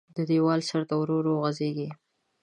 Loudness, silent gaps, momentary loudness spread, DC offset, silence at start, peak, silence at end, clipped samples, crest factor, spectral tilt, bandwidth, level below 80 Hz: -27 LUFS; none; 8 LU; under 0.1%; 0.15 s; -12 dBFS; 0.5 s; under 0.1%; 14 dB; -7 dB/octave; 10.5 kHz; -76 dBFS